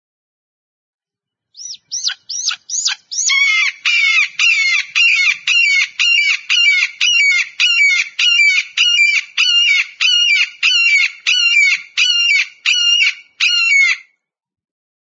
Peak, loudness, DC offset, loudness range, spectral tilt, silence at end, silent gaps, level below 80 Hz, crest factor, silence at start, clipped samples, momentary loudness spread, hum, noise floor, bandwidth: 0 dBFS; -11 LUFS; under 0.1%; 4 LU; 8 dB/octave; 1.05 s; none; -88 dBFS; 14 dB; 1.6 s; under 0.1%; 8 LU; none; -84 dBFS; 7.8 kHz